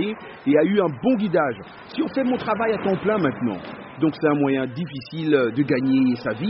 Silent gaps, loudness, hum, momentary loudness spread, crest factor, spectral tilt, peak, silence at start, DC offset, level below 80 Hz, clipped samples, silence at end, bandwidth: none; -22 LUFS; none; 9 LU; 16 dB; -5.5 dB/octave; -6 dBFS; 0 s; under 0.1%; -60 dBFS; under 0.1%; 0 s; 5.8 kHz